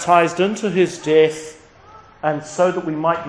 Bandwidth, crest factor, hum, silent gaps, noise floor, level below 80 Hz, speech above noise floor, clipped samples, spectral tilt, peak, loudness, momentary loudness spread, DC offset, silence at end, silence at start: 10.5 kHz; 18 dB; none; none; -45 dBFS; -58 dBFS; 27 dB; under 0.1%; -5 dB/octave; 0 dBFS; -18 LUFS; 9 LU; under 0.1%; 0 s; 0 s